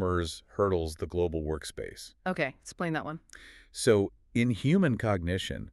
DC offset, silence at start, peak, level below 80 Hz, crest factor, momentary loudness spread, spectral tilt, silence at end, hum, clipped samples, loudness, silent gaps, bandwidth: under 0.1%; 0 s; -12 dBFS; -48 dBFS; 18 dB; 15 LU; -6 dB/octave; 0 s; none; under 0.1%; -30 LUFS; none; 13.5 kHz